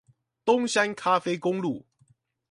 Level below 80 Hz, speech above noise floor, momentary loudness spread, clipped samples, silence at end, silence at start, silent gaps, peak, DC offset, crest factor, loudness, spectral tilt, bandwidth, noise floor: -72 dBFS; 40 dB; 9 LU; under 0.1%; 0.7 s; 0.45 s; none; -8 dBFS; under 0.1%; 18 dB; -26 LUFS; -4 dB/octave; 11.5 kHz; -65 dBFS